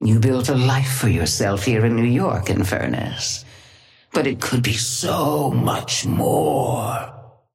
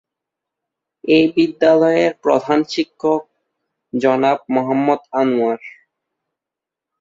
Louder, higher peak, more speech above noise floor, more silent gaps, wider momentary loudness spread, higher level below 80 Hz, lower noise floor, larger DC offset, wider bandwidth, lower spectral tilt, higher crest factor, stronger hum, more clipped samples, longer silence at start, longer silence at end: second, -20 LUFS vs -16 LUFS; second, -6 dBFS vs -2 dBFS; second, 31 dB vs 70 dB; neither; about the same, 6 LU vs 8 LU; first, -46 dBFS vs -62 dBFS; second, -50 dBFS vs -85 dBFS; neither; first, 16.5 kHz vs 7.6 kHz; about the same, -5 dB/octave vs -6 dB/octave; about the same, 14 dB vs 16 dB; neither; neither; second, 0 s vs 1.05 s; second, 0.25 s vs 1.3 s